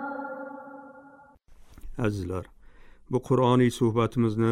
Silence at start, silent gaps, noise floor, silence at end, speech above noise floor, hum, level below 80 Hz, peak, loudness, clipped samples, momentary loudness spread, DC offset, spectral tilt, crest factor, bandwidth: 0 s; none; -53 dBFS; 0 s; 29 dB; none; -50 dBFS; -10 dBFS; -26 LUFS; under 0.1%; 21 LU; under 0.1%; -7.5 dB/octave; 16 dB; 14 kHz